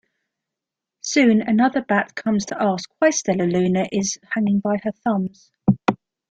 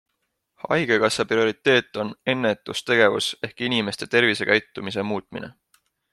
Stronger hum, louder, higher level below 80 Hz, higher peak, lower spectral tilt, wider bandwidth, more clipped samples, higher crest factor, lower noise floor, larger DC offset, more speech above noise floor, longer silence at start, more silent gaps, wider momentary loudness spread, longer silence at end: neither; about the same, -20 LUFS vs -22 LUFS; first, -58 dBFS vs -64 dBFS; about the same, -2 dBFS vs -2 dBFS; about the same, -5 dB/octave vs -4 dB/octave; second, 9 kHz vs 13 kHz; neither; about the same, 18 dB vs 20 dB; first, -85 dBFS vs -76 dBFS; neither; first, 66 dB vs 54 dB; first, 1.05 s vs 0.65 s; neither; second, 7 LU vs 12 LU; second, 0.35 s vs 0.6 s